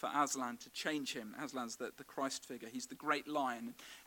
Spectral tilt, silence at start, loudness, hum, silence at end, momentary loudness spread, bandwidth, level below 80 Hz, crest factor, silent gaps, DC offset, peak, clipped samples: -2.5 dB/octave; 0 s; -41 LUFS; none; 0 s; 10 LU; 18 kHz; -82 dBFS; 22 dB; none; under 0.1%; -20 dBFS; under 0.1%